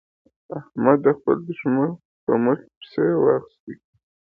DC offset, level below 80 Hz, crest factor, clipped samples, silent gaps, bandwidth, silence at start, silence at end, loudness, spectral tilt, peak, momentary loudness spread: under 0.1%; -66 dBFS; 22 dB; under 0.1%; 2.05-2.27 s, 2.76-2.81 s, 3.60-3.67 s; 4.7 kHz; 0.5 s; 0.6 s; -21 LUFS; -11 dB/octave; -2 dBFS; 18 LU